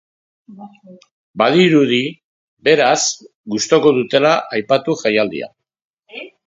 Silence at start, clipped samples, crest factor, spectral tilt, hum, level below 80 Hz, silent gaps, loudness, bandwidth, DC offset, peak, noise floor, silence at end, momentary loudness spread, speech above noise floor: 0.5 s; under 0.1%; 16 dB; -4 dB/octave; none; -64 dBFS; 1.11-1.34 s, 2.24-2.57 s, 3.35-3.44 s, 5.84-5.97 s; -15 LUFS; 7.8 kHz; under 0.1%; 0 dBFS; -36 dBFS; 0.2 s; 19 LU; 20 dB